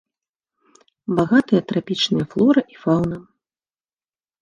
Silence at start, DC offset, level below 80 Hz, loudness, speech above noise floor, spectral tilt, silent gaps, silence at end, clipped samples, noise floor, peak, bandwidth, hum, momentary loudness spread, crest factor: 1.1 s; under 0.1%; -54 dBFS; -19 LUFS; over 72 dB; -6.5 dB/octave; none; 1.2 s; under 0.1%; under -90 dBFS; -2 dBFS; 9.8 kHz; none; 9 LU; 18 dB